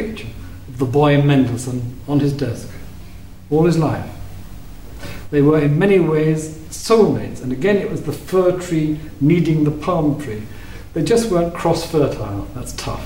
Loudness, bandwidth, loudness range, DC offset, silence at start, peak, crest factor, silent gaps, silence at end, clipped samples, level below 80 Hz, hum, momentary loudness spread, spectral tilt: -18 LUFS; 16 kHz; 4 LU; 1%; 0 s; -2 dBFS; 16 dB; none; 0 s; under 0.1%; -38 dBFS; none; 20 LU; -7 dB/octave